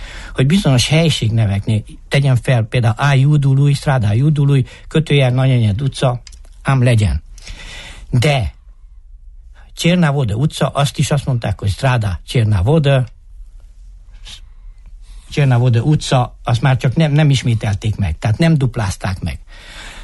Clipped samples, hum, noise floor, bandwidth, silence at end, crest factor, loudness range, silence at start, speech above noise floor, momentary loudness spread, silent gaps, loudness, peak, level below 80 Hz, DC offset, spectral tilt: under 0.1%; none; -39 dBFS; 12 kHz; 0 s; 12 dB; 5 LU; 0 s; 25 dB; 14 LU; none; -15 LUFS; -2 dBFS; -32 dBFS; under 0.1%; -6.5 dB/octave